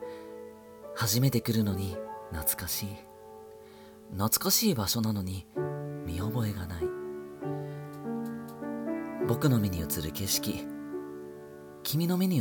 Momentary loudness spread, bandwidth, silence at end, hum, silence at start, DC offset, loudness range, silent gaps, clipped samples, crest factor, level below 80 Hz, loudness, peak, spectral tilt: 20 LU; 19 kHz; 0 s; none; 0 s; under 0.1%; 6 LU; none; under 0.1%; 20 dB; -54 dBFS; -31 LUFS; -12 dBFS; -4.5 dB/octave